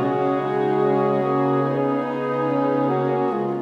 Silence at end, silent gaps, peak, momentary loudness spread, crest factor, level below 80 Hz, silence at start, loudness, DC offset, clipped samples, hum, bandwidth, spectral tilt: 0 s; none; -8 dBFS; 3 LU; 12 dB; -68 dBFS; 0 s; -21 LUFS; under 0.1%; under 0.1%; none; 6.8 kHz; -9 dB/octave